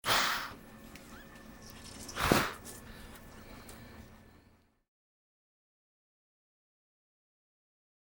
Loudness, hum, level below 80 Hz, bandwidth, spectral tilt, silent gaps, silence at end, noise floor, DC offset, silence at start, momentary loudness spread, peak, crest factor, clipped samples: -32 LUFS; none; -56 dBFS; over 20 kHz; -3 dB/octave; none; 3.9 s; -66 dBFS; under 0.1%; 0.05 s; 23 LU; -8 dBFS; 32 dB; under 0.1%